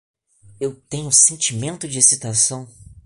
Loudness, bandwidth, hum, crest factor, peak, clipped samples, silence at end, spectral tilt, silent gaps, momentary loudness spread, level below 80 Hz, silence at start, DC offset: -15 LUFS; 11.5 kHz; none; 20 dB; 0 dBFS; under 0.1%; 0.25 s; -2 dB/octave; none; 16 LU; -54 dBFS; 0.6 s; under 0.1%